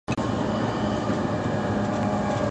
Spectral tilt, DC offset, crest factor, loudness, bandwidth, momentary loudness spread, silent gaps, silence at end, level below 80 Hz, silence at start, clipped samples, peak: -6.5 dB/octave; under 0.1%; 14 dB; -26 LUFS; 9.4 kHz; 1 LU; none; 0 s; -44 dBFS; 0.1 s; under 0.1%; -12 dBFS